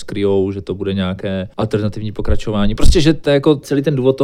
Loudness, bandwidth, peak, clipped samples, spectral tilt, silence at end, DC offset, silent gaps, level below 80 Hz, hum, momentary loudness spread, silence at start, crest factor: -17 LUFS; 11.5 kHz; 0 dBFS; 0.2%; -6.5 dB/octave; 0 s; under 0.1%; none; -22 dBFS; none; 9 LU; 0 s; 14 dB